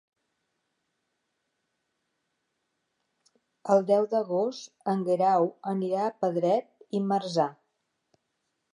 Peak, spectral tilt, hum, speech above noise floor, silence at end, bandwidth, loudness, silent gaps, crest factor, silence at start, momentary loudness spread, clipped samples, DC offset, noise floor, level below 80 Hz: -10 dBFS; -7 dB/octave; none; 53 dB; 1.2 s; 10.5 kHz; -27 LUFS; none; 20 dB; 3.65 s; 8 LU; under 0.1%; under 0.1%; -80 dBFS; -86 dBFS